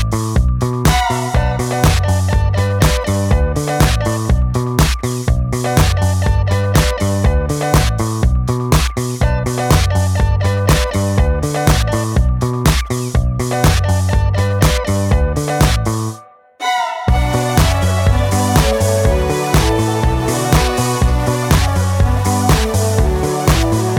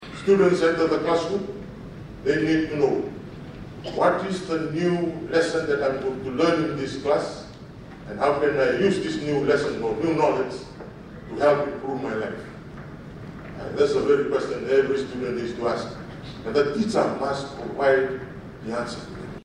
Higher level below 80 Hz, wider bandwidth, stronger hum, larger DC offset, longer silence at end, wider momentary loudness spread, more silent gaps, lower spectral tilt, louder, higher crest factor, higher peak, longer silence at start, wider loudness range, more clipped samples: first, -20 dBFS vs -50 dBFS; first, 19 kHz vs 10.5 kHz; neither; neither; about the same, 0 s vs 0 s; second, 4 LU vs 18 LU; neither; about the same, -5.5 dB/octave vs -6 dB/octave; first, -15 LUFS vs -24 LUFS; about the same, 14 dB vs 16 dB; first, 0 dBFS vs -8 dBFS; about the same, 0 s vs 0 s; about the same, 1 LU vs 2 LU; neither